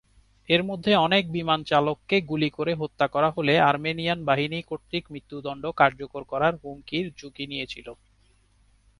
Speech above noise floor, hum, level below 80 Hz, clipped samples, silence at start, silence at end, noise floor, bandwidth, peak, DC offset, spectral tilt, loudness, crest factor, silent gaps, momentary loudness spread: 37 dB; none; -58 dBFS; under 0.1%; 0.5 s; 1.05 s; -62 dBFS; 11 kHz; -4 dBFS; under 0.1%; -6.5 dB/octave; -25 LUFS; 22 dB; none; 15 LU